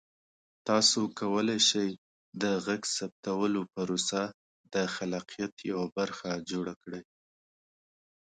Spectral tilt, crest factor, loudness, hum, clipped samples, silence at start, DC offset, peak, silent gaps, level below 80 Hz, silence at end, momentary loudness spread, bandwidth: -3 dB/octave; 22 dB; -30 LUFS; none; under 0.1%; 0.65 s; under 0.1%; -10 dBFS; 1.98-2.32 s, 3.12-3.23 s, 4.34-4.64 s, 5.52-5.57 s, 5.92-5.96 s, 6.76-6.81 s; -72 dBFS; 1.25 s; 14 LU; 9.6 kHz